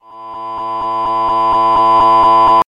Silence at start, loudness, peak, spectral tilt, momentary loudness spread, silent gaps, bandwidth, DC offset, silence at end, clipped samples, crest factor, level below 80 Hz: 0.1 s; -11 LUFS; -2 dBFS; -5.5 dB/octave; 16 LU; none; 9.2 kHz; under 0.1%; 0.05 s; under 0.1%; 10 dB; -42 dBFS